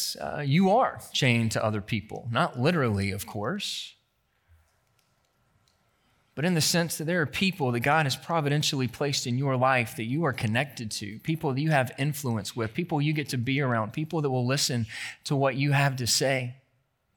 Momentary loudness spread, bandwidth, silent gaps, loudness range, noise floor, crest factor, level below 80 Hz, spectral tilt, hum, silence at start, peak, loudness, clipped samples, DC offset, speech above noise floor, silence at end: 9 LU; 19 kHz; none; 6 LU; -72 dBFS; 20 dB; -64 dBFS; -4.5 dB/octave; none; 0 s; -8 dBFS; -27 LUFS; under 0.1%; under 0.1%; 45 dB; 0.6 s